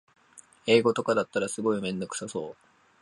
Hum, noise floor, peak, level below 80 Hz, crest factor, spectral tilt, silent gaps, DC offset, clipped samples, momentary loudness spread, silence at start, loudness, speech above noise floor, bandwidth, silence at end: none; -56 dBFS; -8 dBFS; -68 dBFS; 20 dB; -4.5 dB/octave; none; under 0.1%; under 0.1%; 14 LU; 0.35 s; -27 LUFS; 29 dB; 11.5 kHz; 0.5 s